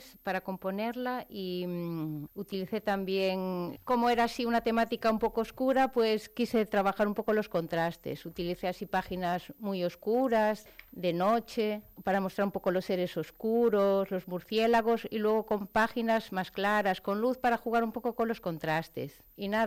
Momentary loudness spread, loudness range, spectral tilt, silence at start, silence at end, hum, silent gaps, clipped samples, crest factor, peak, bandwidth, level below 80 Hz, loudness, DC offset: 9 LU; 4 LU; -6 dB/octave; 0 s; 0 s; none; none; under 0.1%; 14 dB; -16 dBFS; 16.5 kHz; -60 dBFS; -31 LUFS; under 0.1%